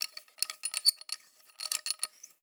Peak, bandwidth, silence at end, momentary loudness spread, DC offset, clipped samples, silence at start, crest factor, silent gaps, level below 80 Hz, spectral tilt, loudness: -8 dBFS; over 20 kHz; 0.15 s; 14 LU; under 0.1%; under 0.1%; 0 s; 28 dB; none; under -90 dBFS; 6 dB/octave; -32 LUFS